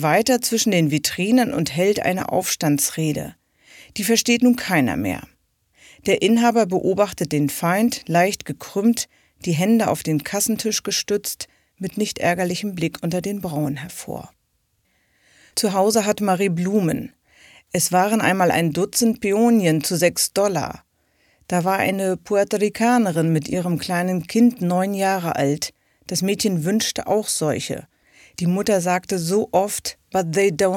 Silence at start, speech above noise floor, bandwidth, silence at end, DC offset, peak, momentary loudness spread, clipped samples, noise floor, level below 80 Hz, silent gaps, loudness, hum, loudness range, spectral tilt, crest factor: 0 s; 48 dB; 18 kHz; 0 s; under 0.1%; -4 dBFS; 10 LU; under 0.1%; -68 dBFS; -56 dBFS; none; -20 LUFS; none; 4 LU; -4.5 dB/octave; 18 dB